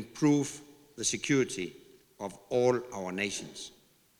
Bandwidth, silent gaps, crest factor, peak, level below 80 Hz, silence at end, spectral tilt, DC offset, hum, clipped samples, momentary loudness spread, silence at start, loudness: 18 kHz; none; 18 dB; -14 dBFS; -68 dBFS; 0.5 s; -4 dB/octave; under 0.1%; none; under 0.1%; 17 LU; 0 s; -31 LUFS